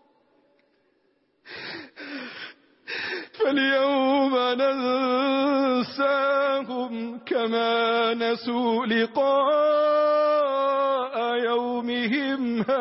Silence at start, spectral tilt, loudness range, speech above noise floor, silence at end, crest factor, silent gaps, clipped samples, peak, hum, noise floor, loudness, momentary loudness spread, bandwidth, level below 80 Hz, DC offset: 1.45 s; -8 dB/octave; 6 LU; 46 dB; 0 s; 12 dB; none; under 0.1%; -12 dBFS; none; -68 dBFS; -23 LUFS; 15 LU; 5.8 kHz; -74 dBFS; under 0.1%